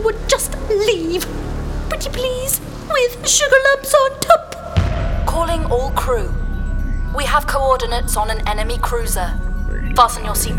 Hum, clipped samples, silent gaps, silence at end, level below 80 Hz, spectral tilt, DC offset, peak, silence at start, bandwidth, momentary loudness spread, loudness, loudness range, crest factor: none; under 0.1%; none; 0 s; -22 dBFS; -3.5 dB/octave; under 0.1%; 0 dBFS; 0 s; 18.5 kHz; 11 LU; -18 LUFS; 4 LU; 16 dB